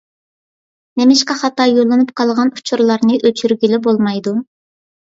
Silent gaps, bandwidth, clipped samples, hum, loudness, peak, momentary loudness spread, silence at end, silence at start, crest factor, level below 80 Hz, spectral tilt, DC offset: none; 7.8 kHz; under 0.1%; none; -14 LUFS; 0 dBFS; 7 LU; 0.6 s; 0.95 s; 14 dB; -62 dBFS; -4.5 dB/octave; under 0.1%